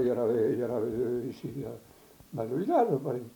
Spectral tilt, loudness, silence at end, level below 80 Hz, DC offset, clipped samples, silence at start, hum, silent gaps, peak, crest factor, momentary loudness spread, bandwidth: -8.5 dB/octave; -30 LUFS; 0.05 s; -64 dBFS; under 0.1%; under 0.1%; 0 s; none; none; -14 dBFS; 16 dB; 14 LU; 19 kHz